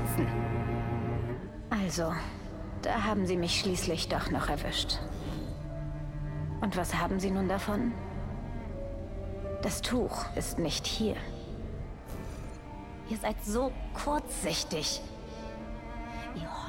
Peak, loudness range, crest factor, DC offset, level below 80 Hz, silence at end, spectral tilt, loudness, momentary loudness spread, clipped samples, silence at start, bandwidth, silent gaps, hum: -18 dBFS; 4 LU; 16 dB; under 0.1%; -42 dBFS; 0 s; -4.5 dB/octave; -34 LUFS; 11 LU; under 0.1%; 0 s; 17.5 kHz; none; none